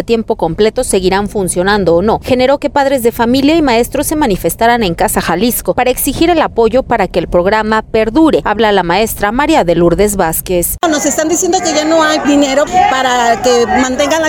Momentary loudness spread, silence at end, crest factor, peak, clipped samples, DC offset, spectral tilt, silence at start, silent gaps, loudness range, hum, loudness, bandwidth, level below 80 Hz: 3 LU; 0 s; 10 dB; 0 dBFS; under 0.1%; under 0.1%; -4 dB/octave; 0 s; none; 1 LU; none; -11 LUFS; 19.5 kHz; -30 dBFS